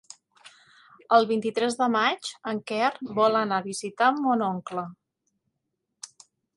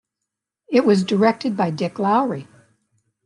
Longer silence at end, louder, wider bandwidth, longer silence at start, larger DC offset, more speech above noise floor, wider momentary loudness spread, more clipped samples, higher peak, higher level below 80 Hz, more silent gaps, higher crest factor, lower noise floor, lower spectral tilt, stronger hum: second, 0.5 s vs 0.8 s; second, -25 LUFS vs -19 LUFS; about the same, 11.5 kHz vs 11 kHz; second, 0.45 s vs 0.7 s; neither; second, 56 dB vs 64 dB; first, 16 LU vs 7 LU; neither; about the same, -6 dBFS vs -4 dBFS; second, -76 dBFS vs -68 dBFS; neither; about the same, 22 dB vs 18 dB; about the same, -81 dBFS vs -82 dBFS; second, -4 dB/octave vs -7 dB/octave; neither